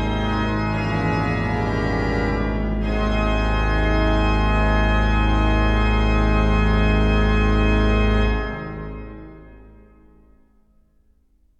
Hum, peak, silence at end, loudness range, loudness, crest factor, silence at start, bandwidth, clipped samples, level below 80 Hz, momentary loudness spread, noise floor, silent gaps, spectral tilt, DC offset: none; -6 dBFS; 2 s; 6 LU; -20 LUFS; 14 dB; 0 s; 8 kHz; under 0.1%; -22 dBFS; 5 LU; -58 dBFS; none; -7.5 dB/octave; under 0.1%